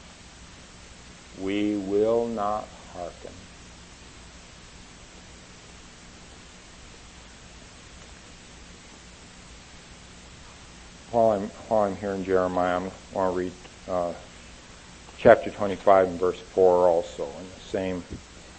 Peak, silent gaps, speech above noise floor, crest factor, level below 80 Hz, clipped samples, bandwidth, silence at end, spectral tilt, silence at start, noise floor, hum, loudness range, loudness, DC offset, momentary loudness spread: -2 dBFS; none; 23 dB; 26 dB; -52 dBFS; under 0.1%; 8.8 kHz; 0 s; -5.5 dB/octave; 0.1 s; -47 dBFS; 60 Hz at -55 dBFS; 23 LU; -25 LUFS; under 0.1%; 25 LU